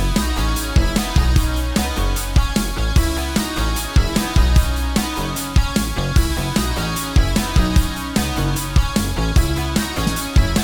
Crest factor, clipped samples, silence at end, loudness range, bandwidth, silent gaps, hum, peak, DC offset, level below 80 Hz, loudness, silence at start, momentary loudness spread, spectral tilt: 16 dB; under 0.1%; 0 s; 0 LU; 19.5 kHz; none; none; -2 dBFS; under 0.1%; -20 dBFS; -19 LUFS; 0 s; 4 LU; -4.5 dB/octave